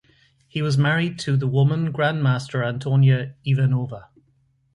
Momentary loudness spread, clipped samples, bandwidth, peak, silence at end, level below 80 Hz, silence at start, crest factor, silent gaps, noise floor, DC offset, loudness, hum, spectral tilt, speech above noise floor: 8 LU; under 0.1%; 10.5 kHz; -8 dBFS; 0.75 s; -58 dBFS; 0.55 s; 14 dB; none; -63 dBFS; under 0.1%; -21 LUFS; none; -7 dB/octave; 43 dB